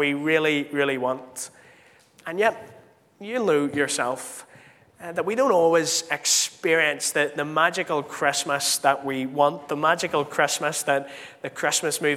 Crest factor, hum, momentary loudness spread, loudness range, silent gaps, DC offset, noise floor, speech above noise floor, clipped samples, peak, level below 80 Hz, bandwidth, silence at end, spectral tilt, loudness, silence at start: 20 dB; none; 15 LU; 5 LU; none; under 0.1%; -55 dBFS; 31 dB; under 0.1%; -4 dBFS; -74 dBFS; 16.5 kHz; 0 s; -2.5 dB/octave; -23 LUFS; 0 s